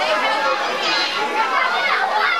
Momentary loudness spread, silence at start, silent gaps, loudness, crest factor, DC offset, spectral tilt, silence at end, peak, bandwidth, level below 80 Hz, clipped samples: 2 LU; 0 s; none; -18 LUFS; 14 dB; 0.3%; -1 dB/octave; 0 s; -6 dBFS; 16 kHz; -70 dBFS; under 0.1%